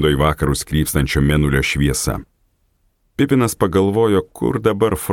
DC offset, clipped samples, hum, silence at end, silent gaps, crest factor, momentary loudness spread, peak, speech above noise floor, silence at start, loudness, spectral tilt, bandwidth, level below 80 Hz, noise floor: under 0.1%; under 0.1%; none; 0 s; none; 16 dB; 6 LU; 0 dBFS; 46 dB; 0 s; -17 LUFS; -5.5 dB/octave; 17.5 kHz; -30 dBFS; -62 dBFS